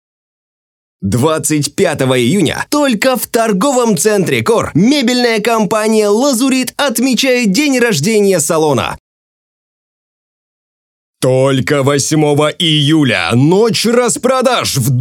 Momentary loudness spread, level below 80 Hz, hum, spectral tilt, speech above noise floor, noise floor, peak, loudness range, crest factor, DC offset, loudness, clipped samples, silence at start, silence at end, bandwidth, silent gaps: 3 LU; -50 dBFS; none; -4.5 dB/octave; over 79 dB; under -90 dBFS; 0 dBFS; 5 LU; 12 dB; under 0.1%; -12 LUFS; under 0.1%; 1 s; 0 s; 18 kHz; 9.00-11.14 s